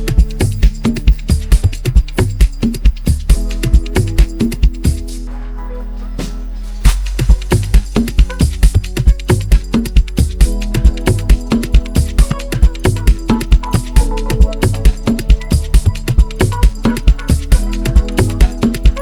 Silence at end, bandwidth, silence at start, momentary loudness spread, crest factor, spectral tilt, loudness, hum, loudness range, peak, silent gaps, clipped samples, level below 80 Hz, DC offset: 0 s; 14.5 kHz; 0 s; 4 LU; 12 dB; -6 dB/octave; -15 LUFS; none; 3 LU; 0 dBFS; none; under 0.1%; -12 dBFS; under 0.1%